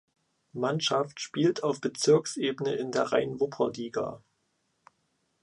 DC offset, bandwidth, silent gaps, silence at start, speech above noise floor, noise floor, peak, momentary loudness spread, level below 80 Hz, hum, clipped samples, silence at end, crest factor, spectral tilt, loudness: under 0.1%; 11 kHz; none; 0.55 s; 47 dB; -75 dBFS; -10 dBFS; 9 LU; -72 dBFS; none; under 0.1%; 1.25 s; 20 dB; -4.5 dB/octave; -29 LUFS